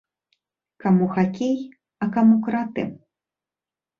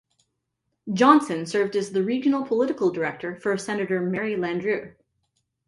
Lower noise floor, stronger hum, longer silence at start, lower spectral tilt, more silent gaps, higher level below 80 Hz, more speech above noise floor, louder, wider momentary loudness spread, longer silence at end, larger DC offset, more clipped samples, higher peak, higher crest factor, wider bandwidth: first, under -90 dBFS vs -78 dBFS; neither; about the same, 0.85 s vs 0.85 s; first, -8.5 dB/octave vs -6 dB/octave; neither; about the same, -64 dBFS vs -68 dBFS; first, over 70 dB vs 55 dB; about the same, -22 LUFS vs -24 LUFS; about the same, 12 LU vs 11 LU; first, 1 s vs 0.8 s; neither; neither; second, -8 dBFS vs -2 dBFS; second, 16 dB vs 22 dB; second, 7 kHz vs 11.5 kHz